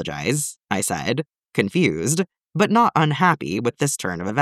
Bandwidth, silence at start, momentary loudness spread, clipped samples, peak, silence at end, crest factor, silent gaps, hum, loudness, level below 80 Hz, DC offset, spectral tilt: 15.5 kHz; 0 s; 8 LU; under 0.1%; -2 dBFS; 0 s; 18 dB; none; none; -21 LUFS; -56 dBFS; under 0.1%; -4.5 dB/octave